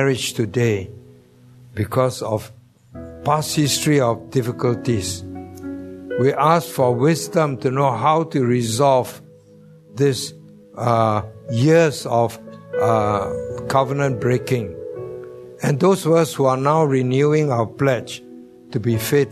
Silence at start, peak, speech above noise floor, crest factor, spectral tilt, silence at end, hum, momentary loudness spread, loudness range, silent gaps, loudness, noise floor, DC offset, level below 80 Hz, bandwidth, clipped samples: 0 s; -2 dBFS; 29 dB; 18 dB; -5.5 dB/octave; 0 s; none; 16 LU; 3 LU; none; -19 LUFS; -47 dBFS; under 0.1%; -54 dBFS; 13.5 kHz; under 0.1%